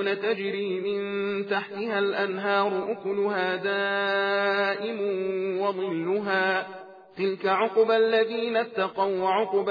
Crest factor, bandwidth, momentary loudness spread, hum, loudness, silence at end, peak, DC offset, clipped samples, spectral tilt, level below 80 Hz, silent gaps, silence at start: 14 dB; 5 kHz; 6 LU; none; -26 LUFS; 0 s; -12 dBFS; under 0.1%; under 0.1%; -7 dB/octave; -84 dBFS; none; 0 s